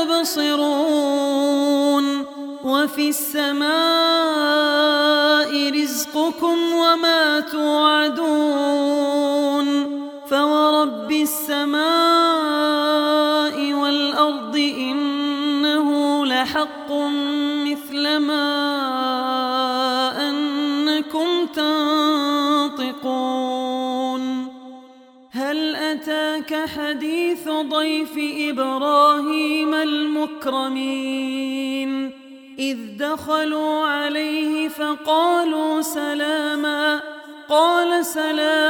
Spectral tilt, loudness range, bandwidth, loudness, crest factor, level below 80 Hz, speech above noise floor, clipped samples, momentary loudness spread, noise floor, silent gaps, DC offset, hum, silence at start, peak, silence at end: -2 dB/octave; 6 LU; 19 kHz; -19 LUFS; 16 dB; -68 dBFS; 28 dB; under 0.1%; 8 LU; -47 dBFS; none; under 0.1%; none; 0 s; -4 dBFS; 0 s